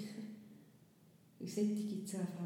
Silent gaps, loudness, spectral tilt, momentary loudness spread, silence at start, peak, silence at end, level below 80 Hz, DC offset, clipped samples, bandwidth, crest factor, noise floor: none; -41 LUFS; -6.5 dB/octave; 21 LU; 0 s; -26 dBFS; 0 s; under -90 dBFS; under 0.1%; under 0.1%; 16.5 kHz; 18 dB; -66 dBFS